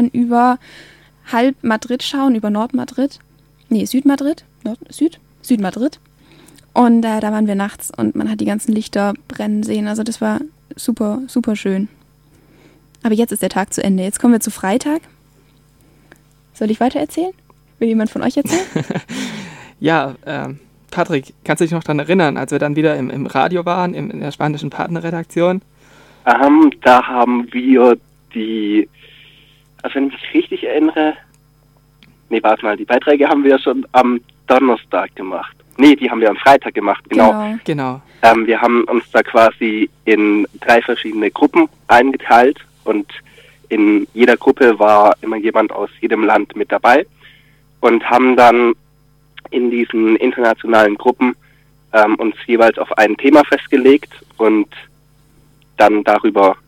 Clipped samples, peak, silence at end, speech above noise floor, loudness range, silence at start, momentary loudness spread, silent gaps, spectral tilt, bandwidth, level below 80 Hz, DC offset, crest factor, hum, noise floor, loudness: under 0.1%; 0 dBFS; 0.15 s; 38 dB; 7 LU; 0 s; 13 LU; none; -5.5 dB/octave; 16 kHz; -54 dBFS; under 0.1%; 14 dB; none; -52 dBFS; -14 LUFS